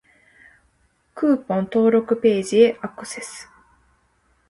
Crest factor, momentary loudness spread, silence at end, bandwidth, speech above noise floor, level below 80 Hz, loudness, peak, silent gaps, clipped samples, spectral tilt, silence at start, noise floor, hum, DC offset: 20 dB; 16 LU; 1.05 s; 11.5 kHz; 45 dB; -62 dBFS; -19 LUFS; -2 dBFS; none; under 0.1%; -5.5 dB/octave; 1.15 s; -64 dBFS; none; under 0.1%